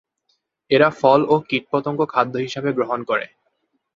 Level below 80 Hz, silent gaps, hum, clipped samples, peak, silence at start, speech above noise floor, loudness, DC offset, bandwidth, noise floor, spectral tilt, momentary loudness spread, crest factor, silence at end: -64 dBFS; none; none; under 0.1%; -2 dBFS; 0.7 s; 51 dB; -19 LUFS; under 0.1%; 7.6 kHz; -70 dBFS; -6.5 dB/octave; 9 LU; 18 dB; 0.7 s